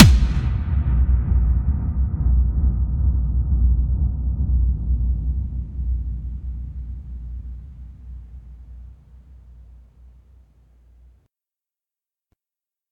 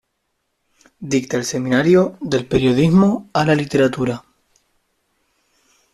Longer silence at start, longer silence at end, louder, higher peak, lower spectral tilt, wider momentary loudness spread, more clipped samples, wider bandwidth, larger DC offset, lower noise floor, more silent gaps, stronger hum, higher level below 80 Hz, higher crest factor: second, 0 s vs 1 s; first, 3.3 s vs 1.75 s; second, -22 LUFS vs -17 LUFS; first, 0 dBFS vs -4 dBFS; about the same, -7 dB/octave vs -6 dB/octave; first, 20 LU vs 9 LU; neither; second, 8 kHz vs 13 kHz; neither; first, under -90 dBFS vs -72 dBFS; neither; neither; first, -22 dBFS vs -48 dBFS; about the same, 20 dB vs 16 dB